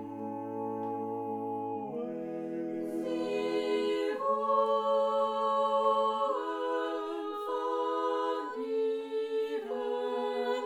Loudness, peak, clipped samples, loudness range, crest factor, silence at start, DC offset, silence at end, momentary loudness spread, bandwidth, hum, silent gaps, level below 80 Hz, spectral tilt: -32 LUFS; -16 dBFS; under 0.1%; 6 LU; 16 dB; 0 s; under 0.1%; 0 s; 9 LU; 13.5 kHz; none; none; -82 dBFS; -5.5 dB/octave